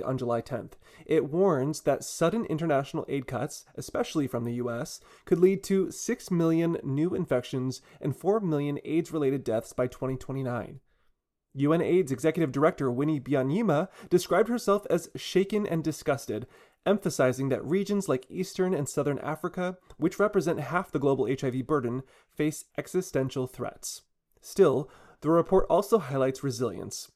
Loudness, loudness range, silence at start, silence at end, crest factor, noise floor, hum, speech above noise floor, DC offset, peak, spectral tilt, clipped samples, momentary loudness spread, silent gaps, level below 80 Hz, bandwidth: -28 LUFS; 3 LU; 0 s; 0.1 s; 18 dB; -71 dBFS; none; 43 dB; under 0.1%; -10 dBFS; -6 dB/octave; under 0.1%; 11 LU; none; -54 dBFS; 14.5 kHz